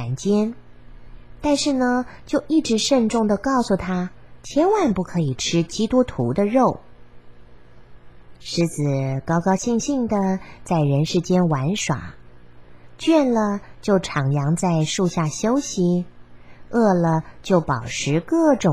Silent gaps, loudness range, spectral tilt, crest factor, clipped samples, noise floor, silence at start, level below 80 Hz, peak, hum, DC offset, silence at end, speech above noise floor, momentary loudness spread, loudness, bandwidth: none; 3 LU; -5.5 dB/octave; 18 dB; under 0.1%; -47 dBFS; 0 s; -48 dBFS; -4 dBFS; none; 0.7%; 0 s; 27 dB; 8 LU; -21 LUFS; 12.5 kHz